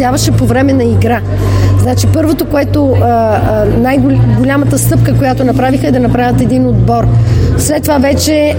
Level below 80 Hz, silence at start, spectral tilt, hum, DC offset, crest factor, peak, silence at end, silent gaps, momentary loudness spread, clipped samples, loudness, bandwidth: -22 dBFS; 0 s; -6.5 dB/octave; none; under 0.1%; 8 dB; 0 dBFS; 0 s; none; 2 LU; under 0.1%; -10 LUFS; 17 kHz